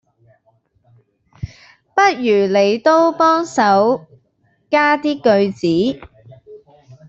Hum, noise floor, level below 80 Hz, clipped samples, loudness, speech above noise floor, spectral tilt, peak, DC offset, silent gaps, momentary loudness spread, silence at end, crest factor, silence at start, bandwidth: none; -61 dBFS; -52 dBFS; under 0.1%; -15 LUFS; 47 dB; -5.5 dB/octave; -2 dBFS; under 0.1%; none; 17 LU; 0.15 s; 16 dB; 1.4 s; 8 kHz